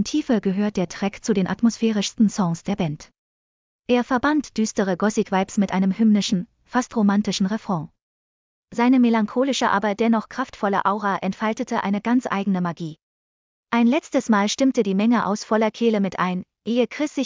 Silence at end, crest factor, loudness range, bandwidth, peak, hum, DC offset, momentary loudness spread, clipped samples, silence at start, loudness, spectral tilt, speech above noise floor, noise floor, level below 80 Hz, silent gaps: 0 s; 16 dB; 3 LU; 7.6 kHz; -6 dBFS; none; under 0.1%; 7 LU; under 0.1%; 0 s; -22 LUFS; -5.5 dB/octave; over 69 dB; under -90 dBFS; -58 dBFS; 3.18-3.83 s, 8.02-8.68 s, 13.02-13.63 s